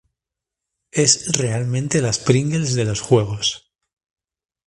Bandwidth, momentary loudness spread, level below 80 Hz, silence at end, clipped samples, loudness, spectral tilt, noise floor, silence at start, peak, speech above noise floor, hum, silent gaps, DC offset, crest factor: 11.5 kHz; 7 LU; -50 dBFS; 1.1 s; under 0.1%; -19 LUFS; -4 dB/octave; -85 dBFS; 0.95 s; 0 dBFS; 67 dB; none; none; under 0.1%; 20 dB